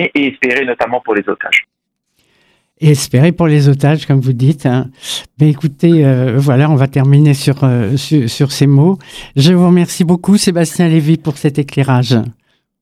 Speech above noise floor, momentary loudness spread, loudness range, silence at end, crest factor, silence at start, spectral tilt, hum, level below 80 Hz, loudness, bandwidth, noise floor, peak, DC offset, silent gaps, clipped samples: 53 dB; 6 LU; 2 LU; 0.5 s; 12 dB; 0 s; -6.5 dB/octave; none; -48 dBFS; -12 LUFS; 14.5 kHz; -63 dBFS; 0 dBFS; under 0.1%; none; under 0.1%